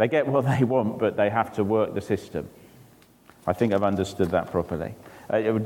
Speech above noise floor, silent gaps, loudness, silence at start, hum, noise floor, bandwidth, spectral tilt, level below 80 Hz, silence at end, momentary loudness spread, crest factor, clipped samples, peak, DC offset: 30 dB; none; -25 LUFS; 0 s; none; -54 dBFS; 18 kHz; -7.5 dB/octave; -56 dBFS; 0 s; 12 LU; 18 dB; under 0.1%; -8 dBFS; under 0.1%